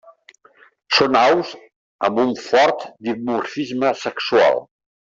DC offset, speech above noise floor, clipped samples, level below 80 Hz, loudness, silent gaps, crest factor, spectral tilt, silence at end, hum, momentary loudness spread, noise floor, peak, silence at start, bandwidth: under 0.1%; 34 dB; under 0.1%; -62 dBFS; -18 LUFS; 1.76-1.99 s; 18 dB; -4 dB/octave; 0.5 s; none; 10 LU; -52 dBFS; -2 dBFS; 0.9 s; 7.8 kHz